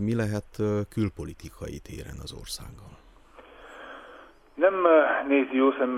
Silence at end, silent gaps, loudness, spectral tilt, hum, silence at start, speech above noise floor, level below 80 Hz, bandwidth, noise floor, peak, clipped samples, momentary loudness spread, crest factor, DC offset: 0 s; none; -25 LUFS; -6.5 dB/octave; none; 0 s; 26 dB; -50 dBFS; 15 kHz; -52 dBFS; -6 dBFS; under 0.1%; 24 LU; 22 dB; under 0.1%